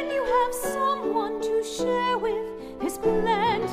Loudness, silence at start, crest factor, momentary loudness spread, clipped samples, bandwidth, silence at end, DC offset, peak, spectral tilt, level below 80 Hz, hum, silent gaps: -25 LUFS; 0 s; 14 dB; 7 LU; under 0.1%; 15.5 kHz; 0 s; under 0.1%; -12 dBFS; -4 dB/octave; -48 dBFS; none; none